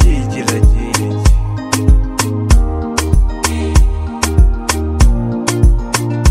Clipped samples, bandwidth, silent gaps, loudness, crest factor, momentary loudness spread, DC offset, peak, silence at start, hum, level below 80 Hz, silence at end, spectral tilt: 0.2%; 15.5 kHz; none; -14 LUFS; 12 dB; 4 LU; under 0.1%; 0 dBFS; 0 s; none; -14 dBFS; 0 s; -5 dB/octave